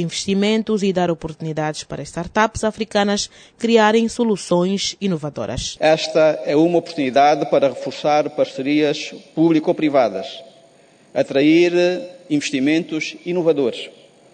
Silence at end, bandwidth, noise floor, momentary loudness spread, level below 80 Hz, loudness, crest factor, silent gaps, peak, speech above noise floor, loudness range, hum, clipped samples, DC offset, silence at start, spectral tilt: 0.45 s; 9.6 kHz; -51 dBFS; 11 LU; -48 dBFS; -18 LUFS; 16 dB; none; -2 dBFS; 33 dB; 2 LU; none; under 0.1%; under 0.1%; 0 s; -5 dB/octave